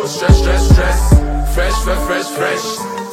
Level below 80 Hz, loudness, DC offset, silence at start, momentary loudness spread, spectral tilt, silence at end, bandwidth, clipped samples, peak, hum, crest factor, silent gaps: -14 dBFS; -14 LUFS; under 0.1%; 0 s; 7 LU; -5.5 dB/octave; 0 s; 16 kHz; 0.1%; 0 dBFS; none; 12 dB; none